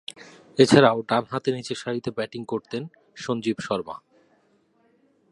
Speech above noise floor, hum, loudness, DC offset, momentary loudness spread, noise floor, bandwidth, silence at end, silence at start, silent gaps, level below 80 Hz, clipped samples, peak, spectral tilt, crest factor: 41 dB; none; -24 LUFS; under 0.1%; 20 LU; -64 dBFS; 11.5 kHz; 1.35 s; 0.2 s; none; -62 dBFS; under 0.1%; 0 dBFS; -5.5 dB/octave; 24 dB